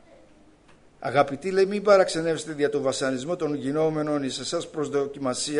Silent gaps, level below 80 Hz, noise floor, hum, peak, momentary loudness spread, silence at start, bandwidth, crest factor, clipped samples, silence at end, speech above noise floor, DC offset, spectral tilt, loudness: none; -62 dBFS; -55 dBFS; none; -6 dBFS; 9 LU; 1 s; 10.5 kHz; 20 dB; under 0.1%; 0 s; 30 dB; under 0.1%; -4.5 dB/octave; -25 LUFS